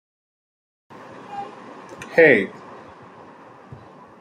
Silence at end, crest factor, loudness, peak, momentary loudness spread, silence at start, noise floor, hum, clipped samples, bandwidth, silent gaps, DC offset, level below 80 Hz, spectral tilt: 1.7 s; 24 dB; -17 LUFS; -2 dBFS; 28 LU; 1.3 s; -45 dBFS; none; under 0.1%; 9.6 kHz; none; under 0.1%; -68 dBFS; -6 dB/octave